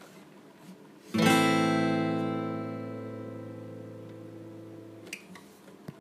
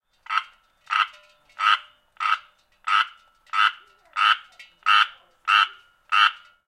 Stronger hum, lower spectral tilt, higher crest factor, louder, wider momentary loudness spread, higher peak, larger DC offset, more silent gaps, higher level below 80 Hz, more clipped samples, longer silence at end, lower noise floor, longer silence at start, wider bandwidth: neither; first, -5 dB/octave vs 4 dB/octave; about the same, 22 dB vs 22 dB; second, -28 LUFS vs -22 LUFS; first, 26 LU vs 9 LU; second, -10 dBFS vs -2 dBFS; neither; neither; about the same, -76 dBFS vs -74 dBFS; neither; second, 0 s vs 0.3 s; about the same, -52 dBFS vs -52 dBFS; second, 0 s vs 0.3 s; first, 15.5 kHz vs 12.5 kHz